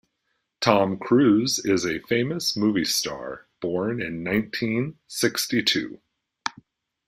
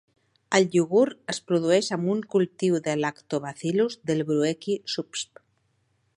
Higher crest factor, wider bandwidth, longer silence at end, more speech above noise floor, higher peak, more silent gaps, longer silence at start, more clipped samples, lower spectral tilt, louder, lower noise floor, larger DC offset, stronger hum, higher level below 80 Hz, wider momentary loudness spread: about the same, 22 dB vs 20 dB; first, 16 kHz vs 11.5 kHz; second, 0.55 s vs 0.95 s; first, 52 dB vs 46 dB; about the same, -4 dBFS vs -4 dBFS; neither; about the same, 0.6 s vs 0.5 s; neither; about the same, -4 dB/octave vs -5 dB/octave; about the same, -24 LUFS vs -25 LUFS; first, -76 dBFS vs -70 dBFS; neither; neither; first, -60 dBFS vs -72 dBFS; first, 13 LU vs 10 LU